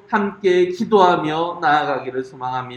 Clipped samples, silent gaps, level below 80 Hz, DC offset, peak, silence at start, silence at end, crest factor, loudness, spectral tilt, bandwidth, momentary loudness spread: under 0.1%; none; -62 dBFS; under 0.1%; 0 dBFS; 0.1 s; 0 s; 18 dB; -18 LUFS; -6 dB/octave; 8.4 kHz; 12 LU